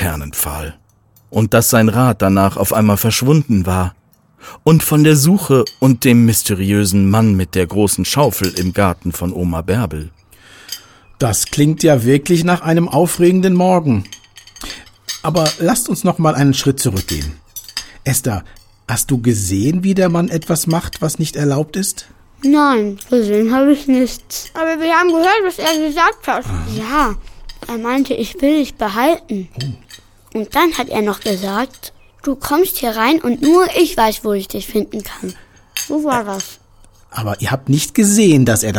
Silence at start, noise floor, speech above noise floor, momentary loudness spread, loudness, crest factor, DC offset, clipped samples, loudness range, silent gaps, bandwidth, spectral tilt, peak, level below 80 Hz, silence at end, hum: 0 s; -51 dBFS; 37 dB; 15 LU; -15 LUFS; 14 dB; under 0.1%; under 0.1%; 5 LU; none; 19 kHz; -5 dB/octave; 0 dBFS; -38 dBFS; 0 s; none